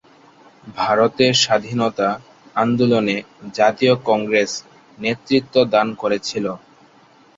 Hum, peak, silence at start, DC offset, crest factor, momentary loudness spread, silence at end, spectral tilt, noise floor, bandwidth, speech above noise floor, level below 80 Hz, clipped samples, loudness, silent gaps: none; -2 dBFS; 0.65 s; under 0.1%; 18 dB; 12 LU; 0.8 s; -4.5 dB/octave; -51 dBFS; 7.8 kHz; 33 dB; -58 dBFS; under 0.1%; -18 LUFS; none